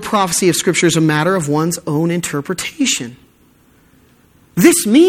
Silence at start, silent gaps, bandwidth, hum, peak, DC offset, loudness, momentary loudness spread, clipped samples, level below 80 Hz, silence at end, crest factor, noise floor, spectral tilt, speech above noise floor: 0 s; none; 17.5 kHz; none; 0 dBFS; under 0.1%; -15 LUFS; 9 LU; under 0.1%; -52 dBFS; 0 s; 16 dB; -51 dBFS; -4 dB/octave; 37 dB